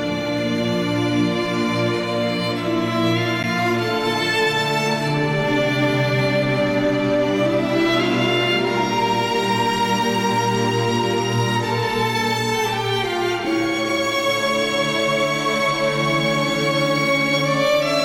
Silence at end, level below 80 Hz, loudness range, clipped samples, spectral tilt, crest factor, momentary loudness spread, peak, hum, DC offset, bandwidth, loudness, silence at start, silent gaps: 0 s; -50 dBFS; 2 LU; under 0.1%; -5 dB/octave; 12 dB; 3 LU; -8 dBFS; none; under 0.1%; 16.5 kHz; -19 LUFS; 0 s; none